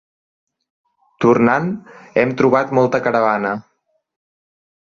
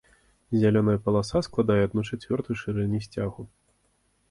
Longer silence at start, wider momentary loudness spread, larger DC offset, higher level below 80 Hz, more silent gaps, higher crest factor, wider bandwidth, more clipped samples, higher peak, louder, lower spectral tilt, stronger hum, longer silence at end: first, 1.2 s vs 0.5 s; about the same, 10 LU vs 10 LU; neither; second, -56 dBFS vs -50 dBFS; neither; about the same, 18 dB vs 16 dB; second, 7 kHz vs 11.5 kHz; neither; first, -2 dBFS vs -10 dBFS; first, -16 LUFS vs -26 LUFS; about the same, -7.5 dB/octave vs -7.5 dB/octave; neither; first, 1.3 s vs 0.85 s